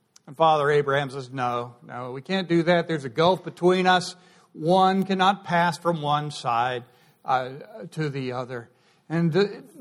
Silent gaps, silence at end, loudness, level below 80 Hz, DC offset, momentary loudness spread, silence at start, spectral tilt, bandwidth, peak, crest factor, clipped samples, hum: none; 0 s; -24 LUFS; -68 dBFS; under 0.1%; 15 LU; 0.3 s; -6 dB/octave; 12.5 kHz; -6 dBFS; 18 dB; under 0.1%; none